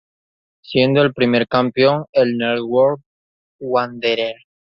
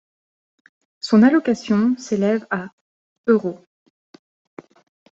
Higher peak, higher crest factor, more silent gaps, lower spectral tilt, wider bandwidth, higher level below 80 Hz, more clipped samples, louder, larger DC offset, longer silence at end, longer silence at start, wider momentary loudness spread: about the same, -2 dBFS vs -2 dBFS; about the same, 16 dB vs 18 dB; first, 2.09-2.13 s, 3.06-3.59 s vs 2.73-3.24 s; first, -8 dB/octave vs -6.5 dB/octave; second, 6 kHz vs 7.8 kHz; first, -58 dBFS vs -66 dBFS; neither; about the same, -17 LUFS vs -19 LUFS; neither; second, 0.45 s vs 1.55 s; second, 0.7 s vs 1.05 s; second, 7 LU vs 17 LU